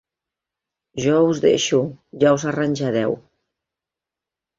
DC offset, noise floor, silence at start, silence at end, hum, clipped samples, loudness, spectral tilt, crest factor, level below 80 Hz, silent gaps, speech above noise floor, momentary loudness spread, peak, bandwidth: under 0.1%; -87 dBFS; 0.95 s; 1.4 s; none; under 0.1%; -19 LUFS; -5 dB/octave; 18 dB; -60 dBFS; none; 69 dB; 11 LU; -4 dBFS; 7.8 kHz